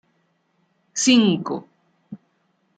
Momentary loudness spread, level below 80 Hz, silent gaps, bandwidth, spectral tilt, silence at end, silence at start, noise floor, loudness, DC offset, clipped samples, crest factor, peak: 27 LU; -70 dBFS; none; 9.4 kHz; -3.5 dB/octave; 0.6 s; 0.95 s; -67 dBFS; -19 LUFS; under 0.1%; under 0.1%; 20 dB; -4 dBFS